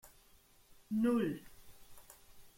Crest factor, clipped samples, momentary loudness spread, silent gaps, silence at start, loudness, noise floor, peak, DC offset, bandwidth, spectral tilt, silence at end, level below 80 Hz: 18 dB; under 0.1%; 26 LU; none; 0.9 s; -36 LUFS; -65 dBFS; -22 dBFS; under 0.1%; 16.5 kHz; -6.5 dB/octave; 0.1 s; -68 dBFS